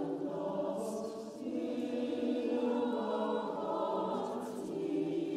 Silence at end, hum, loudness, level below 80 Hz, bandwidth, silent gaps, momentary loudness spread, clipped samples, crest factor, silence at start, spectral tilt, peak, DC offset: 0 s; none; -36 LUFS; -78 dBFS; 14.5 kHz; none; 7 LU; under 0.1%; 14 dB; 0 s; -6.5 dB/octave; -22 dBFS; under 0.1%